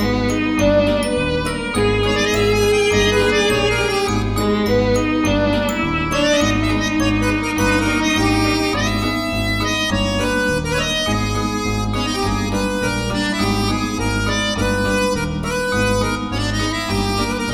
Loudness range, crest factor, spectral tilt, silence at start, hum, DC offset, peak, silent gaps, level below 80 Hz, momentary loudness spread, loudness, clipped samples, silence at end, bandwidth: 3 LU; 14 dB; -4.5 dB/octave; 0 s; none; under 0.1%; -4 dBFS; none; -30 dBFS; 5 LU; -18 LUFS; under 0.1%; 0 s; 18.5 kHz